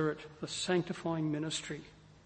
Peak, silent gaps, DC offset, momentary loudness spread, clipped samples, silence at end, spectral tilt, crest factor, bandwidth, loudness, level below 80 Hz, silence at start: -16 dBFS; none; under 0.1%; 12 LU; under 0.1%; 0.05 s; -4.5 dB/octave; 20 dB; 8.8 kHz; -36 LUFS; -66 dBFS; 0 s